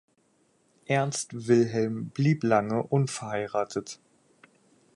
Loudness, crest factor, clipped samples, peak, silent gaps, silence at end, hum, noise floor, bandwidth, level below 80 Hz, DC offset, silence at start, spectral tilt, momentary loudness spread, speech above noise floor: -27 LUFS; 18 dB; under 0.1%; -10 dBFS; none; 1 s; none; -68 dBFS; 11.5 kHz; -68 dBFS; under 0.1%; 0.9 s; -6 dB/octave; 10 LU; 41 dB